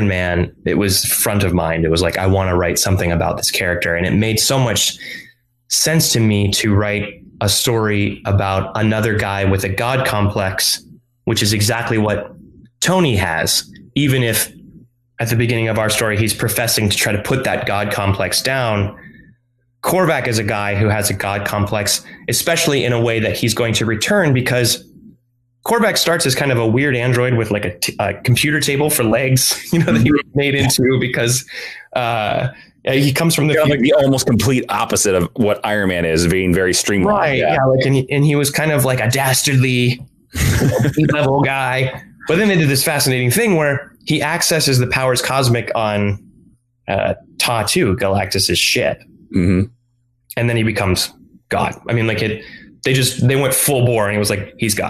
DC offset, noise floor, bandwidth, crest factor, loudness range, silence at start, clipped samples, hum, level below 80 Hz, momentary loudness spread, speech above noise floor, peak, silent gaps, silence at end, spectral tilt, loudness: under 0.1%; -62 dBFS; 14 kHz; 12 dB; 3 LU; 0 s; under 0.1%; none; -42 dBFS; 6 LU; 46 dB; -4 dBFS; none; 0 s; -4 dB/octave; -16 LUFS